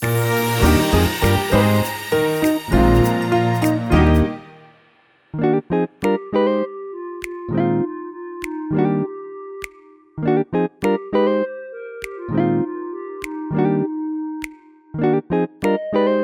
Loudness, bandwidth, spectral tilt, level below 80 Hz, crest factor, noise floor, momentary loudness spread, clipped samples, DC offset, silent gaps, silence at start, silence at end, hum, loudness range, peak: -19 LUFS; over 20 kHz; -6.5 dB/octave; -30 dBFS; 16 dB; -56 dBFS; 16 LU; under 0.1%; under 0.1%; none; 0 s; 0 s; none; 7 LU; -2 dBFS